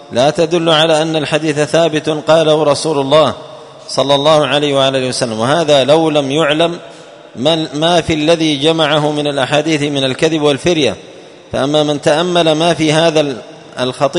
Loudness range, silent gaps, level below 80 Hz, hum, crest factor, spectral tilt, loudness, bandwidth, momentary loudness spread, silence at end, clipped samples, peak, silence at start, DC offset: 2 LU; none; -48 dBFS; none; 12 dB; -4.5 dB/octave; -12 LUFS; 11 kHz; 7 LU; 0 s; under 0.1%; 0 dBFS; 0 s; under 0.1%